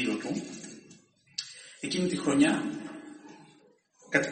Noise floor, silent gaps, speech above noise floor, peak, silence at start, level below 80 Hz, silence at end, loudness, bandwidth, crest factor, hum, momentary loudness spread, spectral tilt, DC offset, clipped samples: -62 dBFS; none; 34 dB; -8 dBFS; 0 s; -70 dBFS; 0 s; -30 LUFS; 8.8 kHz; 24 dB; none; 23 LU; -4.5 dB/octave; under 0.1%; under 0.1%